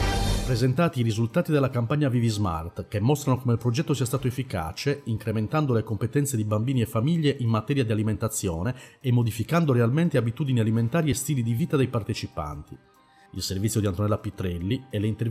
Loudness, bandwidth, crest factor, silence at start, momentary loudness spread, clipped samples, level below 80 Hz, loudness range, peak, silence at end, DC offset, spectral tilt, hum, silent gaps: -26 LUFS; 15.5 kHz; 14 dB; 0 s; 7 LU; under 0.1%; -42 dBFS; 3 LU; -12 dBFS; 0 s; under 0.1%; -6.5 dB/octave; none; none